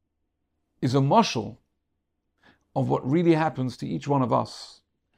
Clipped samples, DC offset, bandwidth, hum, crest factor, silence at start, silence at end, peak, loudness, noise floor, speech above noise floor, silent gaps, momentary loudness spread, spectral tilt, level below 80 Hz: under 0.1%; under 0.1%; 11 kHz; none; 20 dB; 0.8 s; 0.5 s; -6 dBFS; -24 LUFS; -78 dBFS; 54 dB; none; 15 LU; -6.5 dB/octave; -64 dBFS